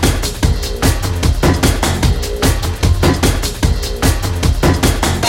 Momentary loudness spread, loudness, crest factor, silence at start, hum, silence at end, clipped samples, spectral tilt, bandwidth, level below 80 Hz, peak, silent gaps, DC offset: 4 LU; -15 LUFS; 14 dB; 0 s; none; 0 s; under 0.1%; -4.5 dB/octave; 17 kHz; -18 dBFS; 0 dBFS; none; under 0.1%